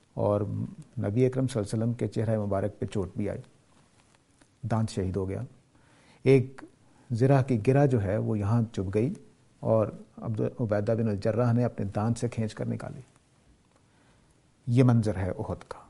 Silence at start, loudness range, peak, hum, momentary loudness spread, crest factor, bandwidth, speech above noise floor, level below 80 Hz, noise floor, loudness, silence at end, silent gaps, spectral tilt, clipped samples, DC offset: 0.15 s; 7 LU; -8 dBFS; none; 13 LU; 20 dB; 11.5 kHz; 36 dB; -58 dBFS; -63 dBFS; -28 LUFS; 0.1 s; none; -8.5 dB/octave; under 0.1%; under 0.1%